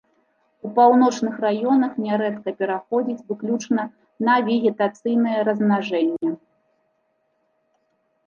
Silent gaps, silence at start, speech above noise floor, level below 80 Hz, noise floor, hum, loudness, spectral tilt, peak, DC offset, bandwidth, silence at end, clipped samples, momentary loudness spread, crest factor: none; 0.65 s; 49 dB; -74 dBFS; -69 dBFS; none; -21 LUFS; -6 dB/octave; -4 dBFS; under 0.1%; 7.2 kHz; 1.9 s; under 0.1%; 10 LU; 18 dB